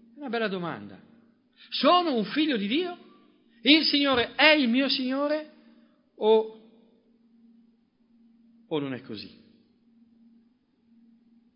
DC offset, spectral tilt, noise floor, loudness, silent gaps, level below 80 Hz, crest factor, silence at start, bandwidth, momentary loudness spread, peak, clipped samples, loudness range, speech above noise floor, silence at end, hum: under 0.1%; -8 dB/octave; -65 dBFS; -24 LUFS; none; -70 dBFS; 26 dB; 0.15 s; 5.6 kHz; 19 LU; -2 dBFS; under 0.1%; 17 LU; 41 dB; 2.3 s; none